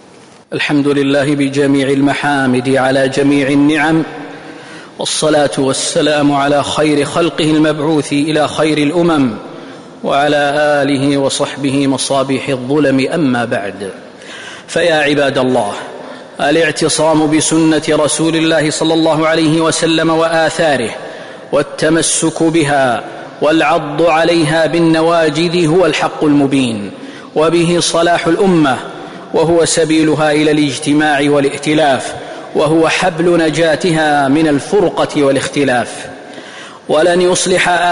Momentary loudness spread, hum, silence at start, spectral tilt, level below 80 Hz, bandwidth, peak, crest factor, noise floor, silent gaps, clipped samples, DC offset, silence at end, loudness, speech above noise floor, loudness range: 13 LU; none; 0.5 s; -4.5 dB/octave; -48 dBFS; 11 kHz; -2 dBFS; 10 dB; -40 dBFS; none; under 0.1%; under 0.1%; 0 s; -12 LUFS; 28 dB; 2 LU